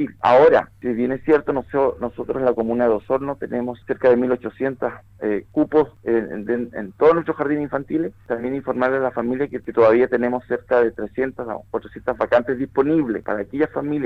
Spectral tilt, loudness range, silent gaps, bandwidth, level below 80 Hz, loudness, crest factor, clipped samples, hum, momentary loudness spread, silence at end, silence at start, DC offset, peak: -8.5 dB/octave; 2 LU; none; 5.8 kHz; -52 dBFS; -21 LUFS; 16 dB; under 0.1%; none; 10 LU; 0 s; 0 s; under 0.1%; -4 dBFS